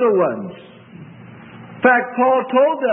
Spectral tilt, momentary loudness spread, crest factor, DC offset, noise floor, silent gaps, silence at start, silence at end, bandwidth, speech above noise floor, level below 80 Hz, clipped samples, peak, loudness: -10.5 dB/octave; 16 LU; 16 dB; under 0.1%; -39 dBFS; none; 0 s; 0 s; 3.6 kHz; 23 dB; -70 dBFS; under 0.1%; -2 dBFS; -16 LUFS